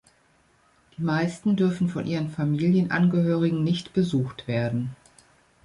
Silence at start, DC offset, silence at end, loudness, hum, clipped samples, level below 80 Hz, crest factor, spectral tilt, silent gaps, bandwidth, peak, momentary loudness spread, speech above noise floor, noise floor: 1 s; under 0.1%; 0.7 s; -25 LUFS; none; under 0.1%; -60 dBFS; 14 dB; -7.5 dB/octave; none; 11 kHz; -10 dBFS; 7 LU; 39 dB; -62 dBFS